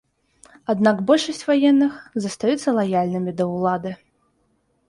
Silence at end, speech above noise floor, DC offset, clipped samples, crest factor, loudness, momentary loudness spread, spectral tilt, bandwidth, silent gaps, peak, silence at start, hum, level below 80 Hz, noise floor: 0.95 s; 46 dB; under 0.1%; under 0.1%; 18 dB; -20 LUFS; 11 LU; -6 dB/octave; 11.5 kHz; none; -4 dBFS; 0.7 s; none; -64 dBFS; -66 dBFS